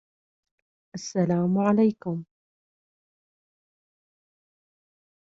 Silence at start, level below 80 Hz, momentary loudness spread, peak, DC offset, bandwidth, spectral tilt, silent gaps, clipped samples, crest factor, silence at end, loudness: 0.95 s; -70 dBFS; 15 LU; -8 dBFS; under 0.1%; 7.8 kHz; -7.5 dB/octave; none; under 0.1%; 20 dB; 3.1 s; -24 LUFS